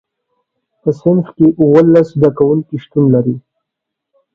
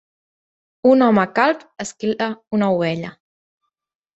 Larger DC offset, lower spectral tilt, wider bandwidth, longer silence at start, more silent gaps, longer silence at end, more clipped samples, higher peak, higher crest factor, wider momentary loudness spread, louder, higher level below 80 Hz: neither; first, -10.5 dB/octave vs -6 dB/octave; second, 6.8 kHz vs 8.2 kHz; about the same, 0.85 s vs 0.85 s; second, none vs 2.47-2.51 s; about the same, 0.95 s vs 1.05 s; neither; about the same, 0 dBFS vs -2 dBFS; second, 12 dB vs 18 dB; about the same, 11 LU vs 13 LU; first, -12 LUFS vs -18 LUFS; first, -52 dBFS vs -64 dBFS